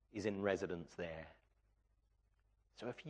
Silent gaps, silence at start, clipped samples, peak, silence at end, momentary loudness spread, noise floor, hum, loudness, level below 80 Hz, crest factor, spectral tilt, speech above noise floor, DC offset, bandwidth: none; 0.15 s; under 0.1%; -24 dBFS; 0 s; 13 LU; -77 dBFS; none; -44 LUFS; -72 dBFS; 22 dB; -6 dB/octave; 34 dB; under 0.1%; 9.6 kHz